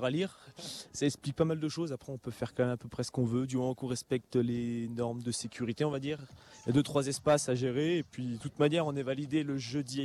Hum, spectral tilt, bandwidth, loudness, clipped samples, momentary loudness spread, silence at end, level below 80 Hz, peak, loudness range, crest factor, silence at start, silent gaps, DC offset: none; -5.5 dB/octave; 13.5 kHz; -33 LUFS; under 0.1%; 10 LU; 0 s; -66 dBFS; -14 dBFS; 3 LU; 18 dB; 0 s; none; under 0.1%